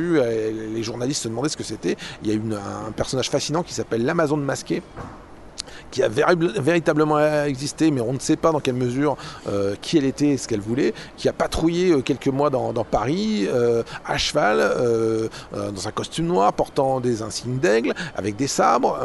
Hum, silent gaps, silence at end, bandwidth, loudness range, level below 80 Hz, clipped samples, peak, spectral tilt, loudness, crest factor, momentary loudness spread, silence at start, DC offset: none; none; 0 s; 11.5 kHz; 4 LU; -46 dBFS; under 0.1%; -2 dBFS; -5 dB/octave; -22 LUFS; 18 dB; 9 LU; 0 s; under 0.1%